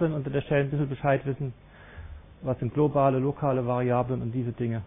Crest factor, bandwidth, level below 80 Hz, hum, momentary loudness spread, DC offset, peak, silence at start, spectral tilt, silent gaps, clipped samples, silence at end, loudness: 16 dB; 3.8 kHz; -50 dBFS; none; 13 LU; under 0.1%; -10 dBFS; 0 s; -12 dB/octave; none; under 0.1%; 0 s; -27 LUFS